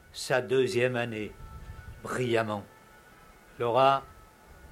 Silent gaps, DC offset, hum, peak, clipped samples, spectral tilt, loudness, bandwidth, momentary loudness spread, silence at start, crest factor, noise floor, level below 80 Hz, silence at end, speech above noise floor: none; under 0.1%; none; -10 dBFS; under 0.1%; -5 dB/octave; -28 LUFS; 16 kHz; 22 LU; 0.15 s; 20 dB; -55 dBFS; -54 dBFS; 0.05 s; 27 dB